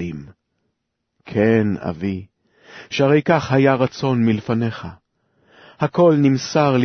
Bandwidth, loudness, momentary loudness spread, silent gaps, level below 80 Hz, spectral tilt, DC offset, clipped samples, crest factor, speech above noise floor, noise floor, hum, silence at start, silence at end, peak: 6.6 kHz; -18 LUFS; 13 LU; none; -54 dBFS; -7 dB/octave; under 0.1%; under 0.1%; 16 dB; 58 dB; -75 dBFS; none; 0 s; 0 s; -2 dBFS